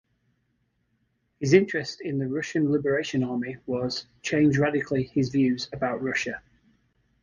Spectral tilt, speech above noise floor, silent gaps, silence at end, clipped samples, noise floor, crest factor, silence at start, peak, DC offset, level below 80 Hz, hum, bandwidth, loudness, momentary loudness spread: -6 dB/octave; 47 dB; none; 0.85 s; under 0.1%; -72 dBFS; 22 dB; 1.4 s; -4 dBFS; under 0.1%; -58 dBFS; none; 9.8 kHz; -26 LUFS; 10 LU